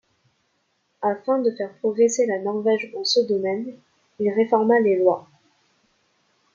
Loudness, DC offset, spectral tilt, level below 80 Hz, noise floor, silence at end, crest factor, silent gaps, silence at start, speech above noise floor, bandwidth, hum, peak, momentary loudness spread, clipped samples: -22 LUFS; under 0.1%; -4 dB/octave; -74 dBFS; -70 dBFS; 1.35 s; 18 dB; none; 1 s; 49 dB; 7.6 kHz; none; -4 dBFS; 9 LU; under 0.1%